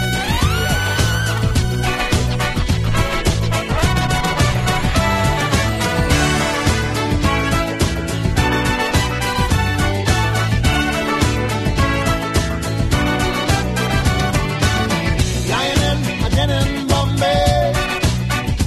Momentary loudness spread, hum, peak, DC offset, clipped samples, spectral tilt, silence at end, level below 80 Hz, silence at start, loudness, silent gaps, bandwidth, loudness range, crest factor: 3 LU; none; -2 dBFS; under 0.1%; under 0.1%; -4.5 dB/octave; 0 s; -24 dBFS; 0 s; -17 LUFS; none; 14 kHz; 1 LU; 14 dB